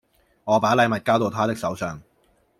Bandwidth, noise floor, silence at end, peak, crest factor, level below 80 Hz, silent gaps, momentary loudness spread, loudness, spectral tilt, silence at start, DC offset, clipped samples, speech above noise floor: 16 kHz; -63 dBFS; 0.6 s; -4 dBFS; 18 dB; -60 dBFS; none; 14 LU; -22 LUFS; -5.5 dB/octave; 0.45 s; under 0.1%; under 0.1%; 42 dB